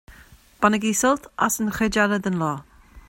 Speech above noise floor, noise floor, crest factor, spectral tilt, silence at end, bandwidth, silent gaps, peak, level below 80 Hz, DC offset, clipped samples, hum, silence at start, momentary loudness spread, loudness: 28 dB; -50 dBFS; 20 dB; -4 dB/octave; 0.1 s; 16.5 kHz; none; -4 dBFS; -48 dBFS; under 0.1%; under 0.1%; none; 0.1 s; 6 LU; -22 LUFS